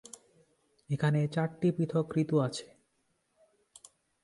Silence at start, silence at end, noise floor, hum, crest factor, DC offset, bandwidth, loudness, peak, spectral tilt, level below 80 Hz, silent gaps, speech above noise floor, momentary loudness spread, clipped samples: 0.9 s; 1.6 s; -76 dBFS; none; 18 dB; under 0.1%; 11.5 kHz; -31 LUFS; -16 dBFS; -7 dB/octave; -70 dBFS; none; 46 dB; 13 LU; under 0.1%